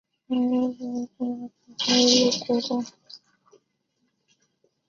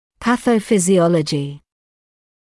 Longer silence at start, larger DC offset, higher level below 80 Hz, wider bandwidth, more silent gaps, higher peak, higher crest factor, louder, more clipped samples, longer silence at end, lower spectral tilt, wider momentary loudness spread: about the same, 0.3 s vs 0.2 s; neither; second, -70 dBFS vs -54 dBFS; second, 7.4 kHz vs 12 kHz; neither; about the same, -6 dBFS vs -4 dBFS; first, 20 dB vs 14 dB; second, -23 LUFS vs -17 LUFS; neither; first, 1.7 s vs 0.95 s; second, -2.5 dB/octave vs -5.5 dB/octave; first, 16 LU vs 9 LU